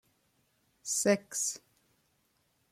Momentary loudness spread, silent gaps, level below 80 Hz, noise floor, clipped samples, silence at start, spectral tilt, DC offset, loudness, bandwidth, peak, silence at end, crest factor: 17 LU; none; -78 dBFS; -74 dBFS; under 0.1%; 0.85 s; -3 dB/octave; under 0.1%; -31 LUFS; 16 kHz; -14 dBFS; 1.15 s; 22 dB